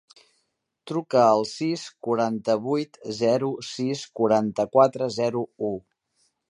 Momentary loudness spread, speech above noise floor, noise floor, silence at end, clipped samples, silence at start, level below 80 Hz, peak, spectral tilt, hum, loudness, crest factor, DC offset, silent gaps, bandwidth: 11 LU; 51 dB; -75 dBFS; 0.7 s; under 0.1%; 0.85 s; -68 dBFS; -4 dBFS; -6 dB/octave; none; -24 LUFS; 20 dB; under 0.1%; none; 11 kHz